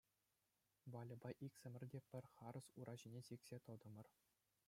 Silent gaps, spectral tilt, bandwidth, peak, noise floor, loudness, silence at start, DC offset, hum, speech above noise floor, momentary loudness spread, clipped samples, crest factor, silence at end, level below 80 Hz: none; -6.5 dB/octave; 16 kHz; -40 dBFS; -89 dBFS; -58 LUFS; 0.85 s; under 0.1%; none; 32 dB; 5 LU; under 0.1%; 20 dB; 0.6 s; -90 dBFS